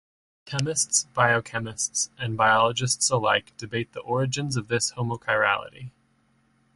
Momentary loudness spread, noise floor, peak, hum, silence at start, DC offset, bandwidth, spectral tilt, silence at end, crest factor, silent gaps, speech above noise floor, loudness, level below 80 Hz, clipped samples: 11 LU; -65 dBFS; -6 dBFS; none; 0.45 s; under 0.1%; 11.5 kHz; -3 dB/octave; 0.85 s; 20 dB; none; 40 dB; -24 LUFS; -60 dBFS; under 0.1%